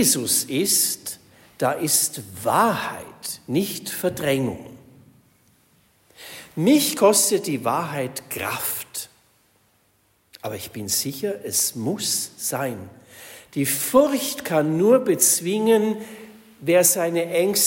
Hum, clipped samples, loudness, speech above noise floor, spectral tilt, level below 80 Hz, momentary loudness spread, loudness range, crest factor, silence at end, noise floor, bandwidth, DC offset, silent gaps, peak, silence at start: none; under 0.1%; -21 LUFS; 42 dB; -3 dB/octave; -64 dBFS; 16 LU; 9 LU; 20 dB; 0 s; -64 dBFS; 16.5 kHz; under 0.1%; none; -4 dBFS; 0 s